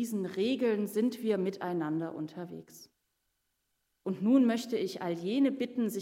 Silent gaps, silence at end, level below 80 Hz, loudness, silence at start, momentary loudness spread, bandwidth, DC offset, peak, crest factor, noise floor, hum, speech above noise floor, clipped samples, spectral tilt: none; 0 s; -84 dBFS; -31 LUFS; 0 s; 14 LU; 16 kHz; under 0.1%; -16 dBFS; 16 dB; -80 dBFS; none; 49 dB; under 0.1%; -6 dB/octave